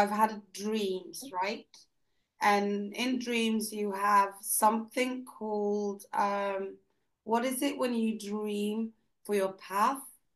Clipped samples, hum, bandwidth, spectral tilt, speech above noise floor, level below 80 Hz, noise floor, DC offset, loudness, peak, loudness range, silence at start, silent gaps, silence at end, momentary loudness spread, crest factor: under 0.1%; none; 12.5 kHz; -3.5 dB/octave; 48 dB; -82 dBFS; -79 dBFS; under 0.1%; -31 LUFS; -12 dBFS; 4 LU; 0 s; none; 0.25 s; 12 LU; 20 dB